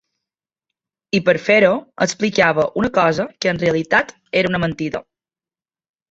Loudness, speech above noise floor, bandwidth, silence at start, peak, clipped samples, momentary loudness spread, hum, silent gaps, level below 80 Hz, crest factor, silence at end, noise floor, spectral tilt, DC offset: -17 LUFS; over 73 dB; 8 kHz; 1.15 s; -2 dBFS; under 0.1%; 8 LU; none; none; -52 dBFS; 18 dB; 1.1 s; under -90 dBFS; -5 dB/octave; under 0.1%